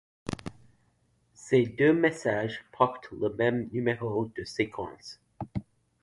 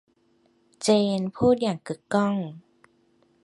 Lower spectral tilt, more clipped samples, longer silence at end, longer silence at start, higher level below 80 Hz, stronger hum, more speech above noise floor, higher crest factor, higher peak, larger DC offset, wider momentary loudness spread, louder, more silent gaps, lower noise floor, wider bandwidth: about the same, -6.5 dB/octave vs -5.5 dB/octave; neither; second, 0.4 s vs 0.85 s; second, 0.25 s vs 0.8 s; about the same, -58 dBFS vs -58 dBFS; neither; about the same, 41 dB vs 41 dB; about the same, 22 dB vs 18 dB; about the same, -8 dBFS vs -8 dBFS; neither; first, 17 LU vs 10 LU; second, -29 LUFS vs -24 LUFS; neither; first, -69 dBFS vs -65 dBFS; about the same, 11.5 kHz vs 11.5 kHz